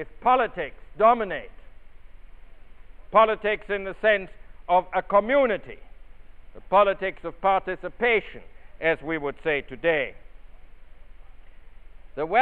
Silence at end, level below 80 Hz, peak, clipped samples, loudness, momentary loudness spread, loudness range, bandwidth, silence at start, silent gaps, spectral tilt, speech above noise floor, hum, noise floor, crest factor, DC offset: 0 s; -48 dBFS; -6 dBFS; under 0.1%; -24 LUFS; 13 LU; 6 LU; 4.4 kHz; 0 s; none; -7.5 dB/octave; 19 dB; none; -42 dBFS; 20 dB; under 0.1%